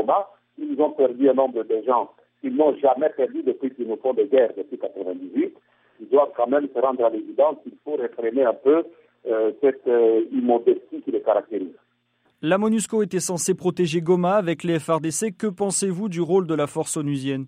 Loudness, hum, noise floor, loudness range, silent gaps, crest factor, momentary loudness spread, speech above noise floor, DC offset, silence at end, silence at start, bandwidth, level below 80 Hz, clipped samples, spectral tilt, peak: -22 LUFS; none; -67 dBFS; 2 LU; none; 16 dB; 11 LU; 45 dB; under 0.1%; 0 s; 0 s; 15.5 kHz; -72 dBFS; under 0.1%; -5.5 dB/octave; -6 dBFS